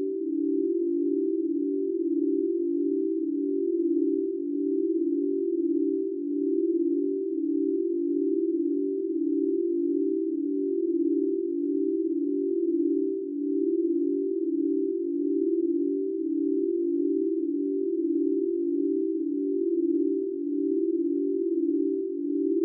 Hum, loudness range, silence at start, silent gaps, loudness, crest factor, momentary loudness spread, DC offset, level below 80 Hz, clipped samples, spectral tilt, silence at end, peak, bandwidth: none; 0 LU; 0 s; none; -27 LUFS; 10 dB; 3 LU; under 0.1%; under -90 dBFS; under 0.1%; -9 dB/octave; 0 s; -16 dBFS; 0.5 kHz